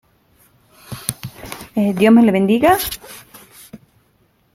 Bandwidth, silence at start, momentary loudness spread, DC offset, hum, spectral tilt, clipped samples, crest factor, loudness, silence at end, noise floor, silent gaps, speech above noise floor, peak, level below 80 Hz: 16.5 kHz; 0.9 s; 23 LU; under 0.1%; none; -5.5 dB/octave; under 0.1%; 18 dB; -15 LUFS; 0.8 s; -59 dBFS; none; 46 dB; 0 dBFS; -50 dBFS